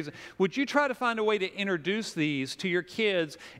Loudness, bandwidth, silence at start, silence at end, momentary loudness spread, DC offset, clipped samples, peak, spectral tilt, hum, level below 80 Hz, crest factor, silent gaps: -29 LUFS; 15.5 kHz; 0 s; 0 s; 5 LU; under 0.1%; under 0.1%; -10 dBFS; -4.5 dB/octave; none; -72 dBFS; 20 dB; none